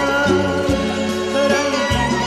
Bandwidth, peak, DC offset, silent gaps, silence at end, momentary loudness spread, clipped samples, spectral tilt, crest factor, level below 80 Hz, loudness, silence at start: 14 kHz; -4 dBFS; under 0.1%; none; 0 s; 4 LU; under 0.1%; -4.5 dB/octave; 14 dB; -34 dBFS; -18 LUFS; 0 s